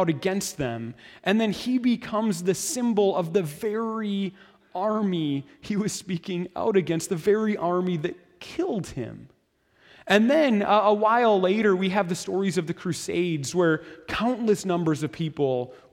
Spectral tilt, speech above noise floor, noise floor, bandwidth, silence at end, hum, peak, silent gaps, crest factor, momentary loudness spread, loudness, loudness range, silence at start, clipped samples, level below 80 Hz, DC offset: -5.5 dB/octave; 40 dB; -64 dBFS; 16.5 kHz; 0.15 s; none; -6 dBFS; none; 18 dB; 11 LU; -25 LUFS; 6 LU; 0 s; under 0.1%; -60 dBFS; under 0.1%